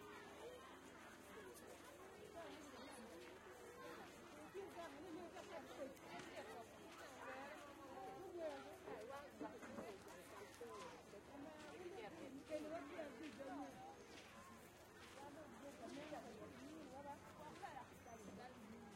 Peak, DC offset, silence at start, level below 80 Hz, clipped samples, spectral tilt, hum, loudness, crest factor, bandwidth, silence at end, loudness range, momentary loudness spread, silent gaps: -36 dBFS; under 0.1%; 0 s; -80 dBFS; under 0.1%; -4 dB/octave; none; -57 LUFS; 20 dB; 16 kHz; 0 s; 3 LU; 7 LU; none